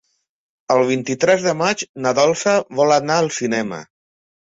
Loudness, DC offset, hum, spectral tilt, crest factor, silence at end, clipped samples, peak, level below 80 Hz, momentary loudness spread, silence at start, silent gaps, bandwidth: -18 LUFS; under 0.1%; none; -4 dB/octave; 16 dB; 0.7 s; under 0.1%; -2 dBFS; -62 dBFS; 6 LU; 0.7 s; 1.89-1.94 s; 8 kHz